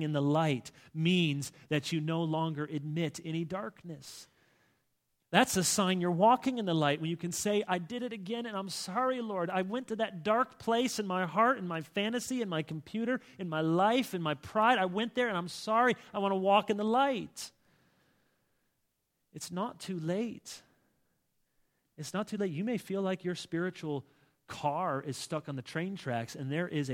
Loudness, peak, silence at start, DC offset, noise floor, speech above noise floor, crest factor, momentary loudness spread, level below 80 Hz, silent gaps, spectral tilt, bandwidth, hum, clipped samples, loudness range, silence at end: -32 LUFS; -8 dBFS; 0 s; under 0.1%; -80 dBFS; 48 dB; 24 dB; 11 LU; -72 dBFS; none; -5 dB/octave; 17 kHz; none; under 0.1%; 9 LU; 0 s